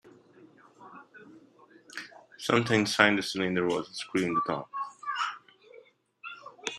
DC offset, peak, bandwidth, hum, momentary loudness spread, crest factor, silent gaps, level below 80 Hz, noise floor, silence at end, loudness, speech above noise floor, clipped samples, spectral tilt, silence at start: under 0.1%; -2 dBFS; 13.5 kHz; none; 25 LU; 30 dB; none; -70 dBFS; -58 dBFS; 0 s; -28 LUFS; 30 dB; under 0.1%; -4.5 dB/octave; 0.05 s